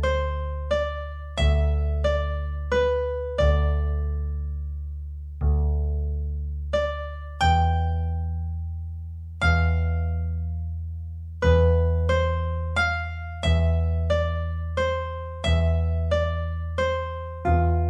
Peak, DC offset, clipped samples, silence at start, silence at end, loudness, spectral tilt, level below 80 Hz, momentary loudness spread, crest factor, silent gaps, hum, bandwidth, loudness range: -8 dBFS; under 0.1%; under 0.1%; 0 s; 0 s; -25 LUFS; -7 dB/octave; -28 dBFS; 11 LU; 16 dB; none; 50 Hz at -60 dBFS; 8.4 kHz; 3 LU